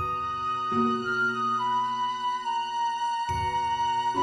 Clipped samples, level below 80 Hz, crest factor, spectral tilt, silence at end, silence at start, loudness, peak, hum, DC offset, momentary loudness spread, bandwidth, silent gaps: under 0.1%; -54 dBFS; 12 dB; -4.5 dB/octave; 0 s; 0 s; -27 LUFS; -14 dBFS; none; under 0.1%; 4 LU; 12 kHz; none